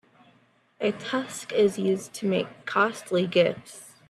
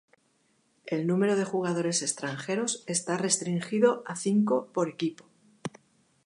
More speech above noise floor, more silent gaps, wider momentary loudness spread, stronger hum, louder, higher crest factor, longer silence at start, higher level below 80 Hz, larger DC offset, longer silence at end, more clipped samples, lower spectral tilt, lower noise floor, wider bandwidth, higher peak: second, 37 dB vs 42 dB; neither; second, 7 LU vs 10 LU; neither; about the same, -26 LUFS vs -28 LUFS; about the same, 18 dB vs 18 dB; about the same, 0.8 s vs 0.85 s; first, -70 dBFS vs -78 dBFS; neither; second, 0.2 s vs 0.55 s; neither; about the same, -5 dB/octave vs -4.5 dB/octave; second, -63 dBFS vs -70 dBFS; first, 13 kHz vs 11.5 kHz; about the same, -8 dBFS vs -10 dBFS